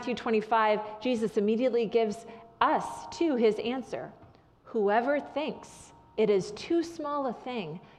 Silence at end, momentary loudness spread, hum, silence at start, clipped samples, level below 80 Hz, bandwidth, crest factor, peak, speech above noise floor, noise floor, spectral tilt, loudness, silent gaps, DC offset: 0.1 s; 13 LU; none; 0 s; under 0.1%; -66 dBFS; 11.5 kHz; 20 dB; -10 dBFS; 26 dB; -55 dBFS; -5.5 dB/octave; -29 LUFS; none; under 0.1%